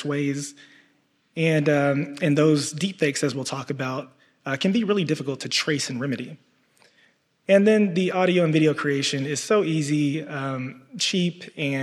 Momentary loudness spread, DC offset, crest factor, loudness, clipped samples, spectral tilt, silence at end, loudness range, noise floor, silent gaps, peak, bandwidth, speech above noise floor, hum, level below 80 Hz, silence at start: 12 LU; under 0.1%; 18 dB; -23 LUFS; under 0.1%; -5 dB/octave; 0 s; 5 LU; -65 dBFS; none; -6 dBFS; 13 kHz; 42 dB; none; -74 dBFS; 0 s